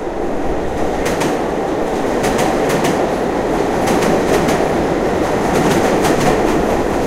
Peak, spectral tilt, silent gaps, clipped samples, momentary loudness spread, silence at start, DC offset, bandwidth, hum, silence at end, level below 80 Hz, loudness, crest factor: 0 dBFS; -5 dB/octave; none; under 0.1%; 5 LU; 0 s; under 0.1%; 16 kHz; none; 0 s; -30 dBFS; -16 LUFS; 14 dB